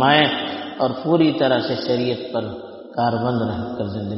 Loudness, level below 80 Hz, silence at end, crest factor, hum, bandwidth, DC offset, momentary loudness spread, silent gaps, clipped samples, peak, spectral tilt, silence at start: -21 LUFS; -54 dBFS; 0 s; 18 dB; none; 5.8 kHz; under 0.1%; 11 LU; none; under 0.1%; -2 dBFS; -3.5 dB/octave; 0 s